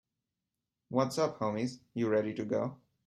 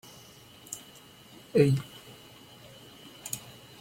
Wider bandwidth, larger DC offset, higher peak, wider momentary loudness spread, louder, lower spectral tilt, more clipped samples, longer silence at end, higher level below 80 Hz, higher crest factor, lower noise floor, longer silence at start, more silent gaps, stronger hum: second, 13 kHz vs 16.5 kHz; neither; second, -14 dBFS vs -10 dBFS; second, 6 LU vs 26 LU; second, -33 LUFS vs -30 LUFS; about the same, -6 dB/octave vs -6 dB/octave; neither; about the same, 0.3 s vs 0.3 s; second, -74 dBFS vs -66 dBFS; about the same, 20 dB vs 24 dB; first, -88 dBFS vs -53 dBFS; first, 0.9 s vs 0.7 s; neither; neither